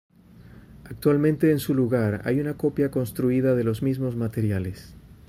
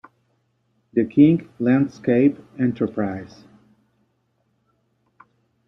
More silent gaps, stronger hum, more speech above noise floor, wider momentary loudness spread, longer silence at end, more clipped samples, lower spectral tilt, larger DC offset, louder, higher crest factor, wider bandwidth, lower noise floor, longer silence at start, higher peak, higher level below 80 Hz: neither; neither; second, 25 dB vs 49 dB; second, 6 LU vs 12 LU; second, 0.3 s vs 2.4 s; neither; second, -8 dB/octave vs -9.5 dB/octave; neither; second, -24 LUFS vs -20 LUFS; about the same, 16 dB vs 20 dB; first, 16 kHz vs 6.2 kHz; second, -48 dBFS vs -68 dBFS; second, 0.4 s vs 0.95 s; second, -8 dBFS vs -2 dBFS; first, -52 dBFS vs -62 dBFS